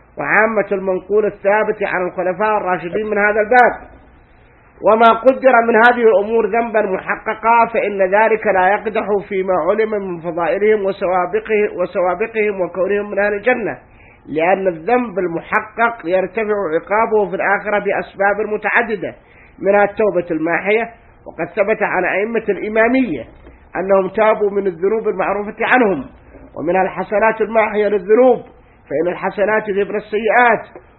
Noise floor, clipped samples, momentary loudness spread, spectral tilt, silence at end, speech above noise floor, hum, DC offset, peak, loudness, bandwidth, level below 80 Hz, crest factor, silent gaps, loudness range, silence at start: -47 dBFS; under 0.1%; 8 LU; -8.5 dB/octave; 0.2 s; 32 dB; none; under 0.1%; 0 dBFS; -16 LUFS; 4.3 kHz; -50 dBFS; 16 dB; none; 4 LU; 0.15 s